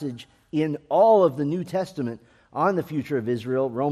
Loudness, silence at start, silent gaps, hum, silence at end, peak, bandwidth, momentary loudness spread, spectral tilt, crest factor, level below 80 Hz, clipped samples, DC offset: -24 LUFS; 0 s; none; none; 0 s; -6 dBFS; 13.5 kHz; 16 LU; -8 dB/octave; 18 dB; -66 dBFS; under 0.1%; under 0.1%